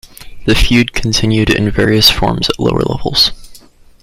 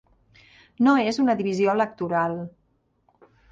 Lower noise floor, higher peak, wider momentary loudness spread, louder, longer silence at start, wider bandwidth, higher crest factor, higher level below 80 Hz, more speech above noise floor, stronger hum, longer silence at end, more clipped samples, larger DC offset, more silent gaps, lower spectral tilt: second, -39 dBFS vs -66 dBFS; first, 0 dBFS vs -8 dBFS; second, 6 LU vs 9 LU; first, -12 LUFS vs -23 LUFS; second, 0.2 s vs 0.8 s; first, 16.5 kHz vs 7.8 kHz; about the same, 12 dB vs 16 dB; first, -24 dBFS vs -64 dBFS; second, 28 dB vs 44 dB; neither; second, 0.45 s vs 1 s; neither; neither; neither; second, -4.5 dB/octave vs -6.5 dB/octave